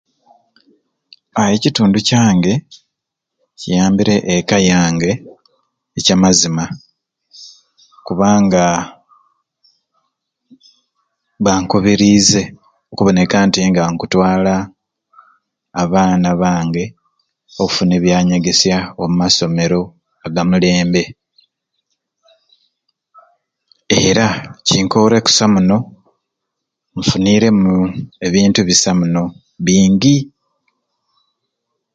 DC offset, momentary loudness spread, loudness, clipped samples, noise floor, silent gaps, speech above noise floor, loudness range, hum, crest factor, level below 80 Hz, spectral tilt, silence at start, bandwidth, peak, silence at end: under 0.1%; 12 LU; -13 LUFS; under 0.1%; -78 dBFS; none; 66 dB; 5 LU; none; 16 dB; -44 dBFS; -4.5 dB/octave; 1.35 s; 9.2 kHz; 0 dBFS; 1.7 s